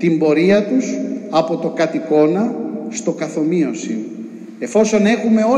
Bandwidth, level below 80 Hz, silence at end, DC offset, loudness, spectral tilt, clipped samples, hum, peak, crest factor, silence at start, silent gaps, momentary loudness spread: 10.5 kHz; -62 dBFS; 0 s; under 0.1%; -17 LUFS; -6 dB/octave; under 0.1%; none; -4 dBFS; 14 dB; 0 s; none; 11 LU